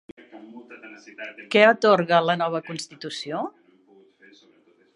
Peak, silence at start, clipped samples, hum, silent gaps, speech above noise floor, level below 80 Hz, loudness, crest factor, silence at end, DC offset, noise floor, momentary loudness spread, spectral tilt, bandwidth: -2 dBFS; 0.35 s; under 0.1%; none; none; 37 dB; -76 dBFS; -21 LUFS; 24 dB; 1.45 s; under 0.1%; -59 dBFS; 26 LU; -4.5 dB/octave; 11 kHz